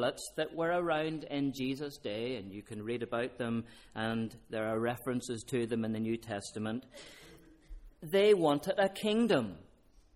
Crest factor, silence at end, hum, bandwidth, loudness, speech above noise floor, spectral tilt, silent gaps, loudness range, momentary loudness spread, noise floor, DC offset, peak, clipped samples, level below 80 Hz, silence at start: 18 dB; 0.55 s; none; 15.5 kHz; -34 LUFS; 24 dB; -5.5 dB/octave; none; 6 LU; 14 LU; -57 dBFS; under 0.1%; -16 dBFS; under 0.1%; -62 dBFS; 0 s